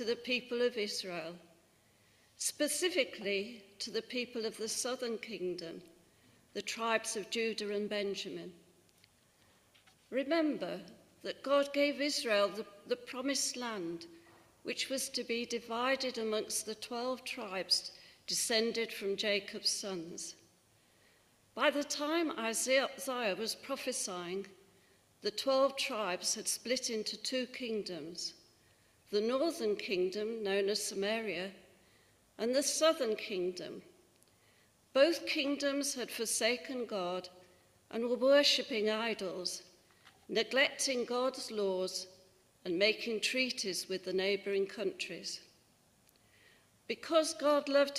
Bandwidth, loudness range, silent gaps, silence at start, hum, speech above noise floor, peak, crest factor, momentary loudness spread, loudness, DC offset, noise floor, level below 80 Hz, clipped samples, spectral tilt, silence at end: 15.5 kHz; 5 LU; none; 0 s; none; 34 dB; -14 dBFS; 22 dB; 12 LU; -35 LUFS; under 0.1%; -69 dBFS; -80 dBFS; under 0.1%; -2 dB/octave; 0 s